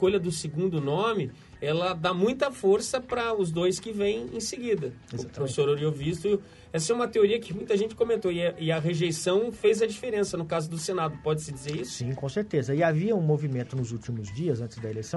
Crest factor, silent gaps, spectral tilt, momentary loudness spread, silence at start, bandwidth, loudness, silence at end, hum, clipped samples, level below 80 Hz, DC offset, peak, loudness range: 18 dB; none; -5.5 dB/octave; 8 LU; 0 s; 11.5 kHz; -28 LUFS; 0 s; none; under 0.1%; -58 dBFS; under 0.1%; -10 dBFS; 2 LU